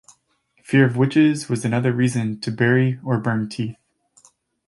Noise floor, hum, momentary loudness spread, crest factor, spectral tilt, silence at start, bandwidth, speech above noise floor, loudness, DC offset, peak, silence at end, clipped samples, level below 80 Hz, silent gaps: -65 dBFS; none; 9 LU; 18 dB; -7 dB/octave; 0.7 s; 11.5 kHz; 46 dB; -20 LUFS; under 0.1%; -2 dBFS; 0.95 s; under 0.1%; -60 dBFS; none